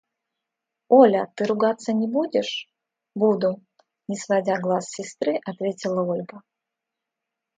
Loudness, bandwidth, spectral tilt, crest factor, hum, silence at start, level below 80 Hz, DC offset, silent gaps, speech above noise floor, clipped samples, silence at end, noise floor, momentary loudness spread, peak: -23 LUFS; 9.4 kHz; -5.5 dB/octave; 22 dB; none; 0.9 s; -74 dBFS; under 0.1%; none; 63 dB; under 0.1%; 1.2 s; -85 dBFS; 16 LU; -2 dBFS